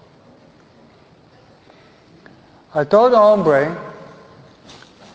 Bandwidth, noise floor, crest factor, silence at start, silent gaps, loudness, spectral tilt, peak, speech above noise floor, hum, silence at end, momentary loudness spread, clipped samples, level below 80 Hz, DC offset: 8 kHz; -49 dBFS; 20 dB; 2.75 s; none; -14 LUFS; -7 dB/octave; 0 dBFS; 36 dB; none; 1.2 s; 23 LU; under 0.1%; -60 dBFS; under 0.1%